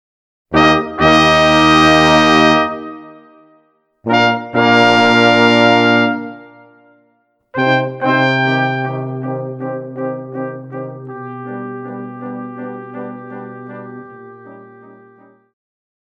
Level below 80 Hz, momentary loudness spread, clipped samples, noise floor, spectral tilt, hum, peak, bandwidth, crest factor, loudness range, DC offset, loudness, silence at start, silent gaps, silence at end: -42 dBFS; 20 LU; under 0.1%; -60 dBFS; -5 dB/octave; none; 0 dBFS; 12 kHz; 16 dB; 18 LU; under 0.1%; -12 LUFS; 0.5 s; none; 1.4 s